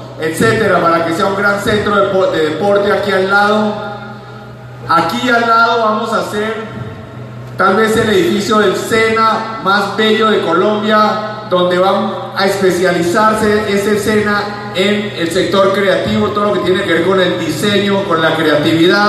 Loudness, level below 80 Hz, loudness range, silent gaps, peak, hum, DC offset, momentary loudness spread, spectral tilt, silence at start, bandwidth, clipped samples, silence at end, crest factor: -12 LUFS; -46 dBFS; 2 LU; none; 0 dBFS; none; under 0.1%; 9 LU; -5 dB/octave; 0 s; 14 kHz; under 0.1%; 0 s; 12 dB